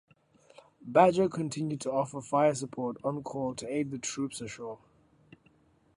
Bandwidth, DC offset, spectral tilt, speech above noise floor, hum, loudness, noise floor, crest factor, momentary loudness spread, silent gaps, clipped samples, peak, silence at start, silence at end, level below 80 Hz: 11.5 kHz; under 0.1%; -5.5 dB/octave; 35 dB; none; -30 LUFS; -65 dBFS; 24 dB; 16 LU; none; under 0.1%; -8 dBFS; 0.85 s; 1.2 s; -68 dBFS